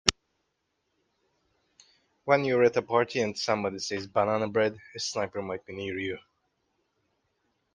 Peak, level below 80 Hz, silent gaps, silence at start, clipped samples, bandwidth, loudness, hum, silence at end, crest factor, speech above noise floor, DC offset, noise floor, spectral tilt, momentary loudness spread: -2 dBFS; -62 dBFS; none; 0.05 s; under 0.1%; 10 kHz; -28 LUFS; none; 1.55 s; 30 dB; 51 dB; under 0.1%; -78 dBFS; -3.5 dB/octave; 12 LU